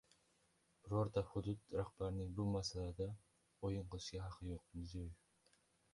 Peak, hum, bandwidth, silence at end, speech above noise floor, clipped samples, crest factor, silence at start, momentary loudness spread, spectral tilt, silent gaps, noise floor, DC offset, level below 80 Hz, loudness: -26 dBFS; none; 11.5 kHz; 0.8 s; 34 dB; under 0.1%; 20 dB; 0.85 s; 10 LU; -6.5 dB/octave; none; -78 dBFS; under 0.1%; -58 dBFS; -46 LUFS